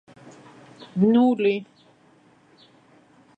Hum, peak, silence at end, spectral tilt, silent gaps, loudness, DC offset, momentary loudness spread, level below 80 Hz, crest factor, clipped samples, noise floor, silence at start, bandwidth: none; -8 dBFS; 1.75 s; -8.5 dB/octave; none; -21 LUFS; under 0.1%; 13 LU; -72 dBFS; 18 dB; under 0.1%; -57 dBFS; 0.8 s; 7.2 kHz